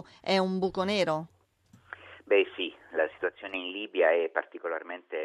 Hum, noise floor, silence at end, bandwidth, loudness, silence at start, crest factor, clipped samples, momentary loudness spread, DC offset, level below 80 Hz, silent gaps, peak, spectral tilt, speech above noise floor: none; -62 dBFS; 0 s; 11.5 kHz; -29 LUFS; 0.25 s; 20 dB; under 0.1%; 16 LU; under 0.1%; -70 dBFS; none; -12 dBFS; -5.5 dB/octave; 33 dB